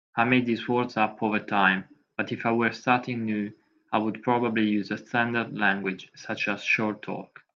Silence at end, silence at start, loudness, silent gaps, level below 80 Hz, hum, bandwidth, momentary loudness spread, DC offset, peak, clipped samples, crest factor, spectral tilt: 0.3 s; 0.15 s; -26 LUFS; none; -72 dBFS; none; 7.2 kHz; 11 LU; under 0.1%; -6 dBFS; under 0.1%; 20 dB; -6 dB/octave